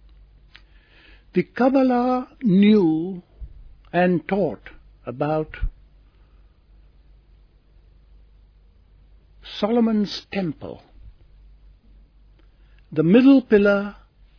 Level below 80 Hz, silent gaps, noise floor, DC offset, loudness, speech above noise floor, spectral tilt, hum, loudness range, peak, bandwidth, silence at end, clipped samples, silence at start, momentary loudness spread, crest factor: -44 dBFS; none; -53 dBFS; under 0.1%; -20 LUFS; 34 dB; -8.5 dB/octave; none; 12 LU; -2 dBFS; 5.4 kHz; 0.45 s; under 0.1%; 1.35 s; 21 LU; 20 dB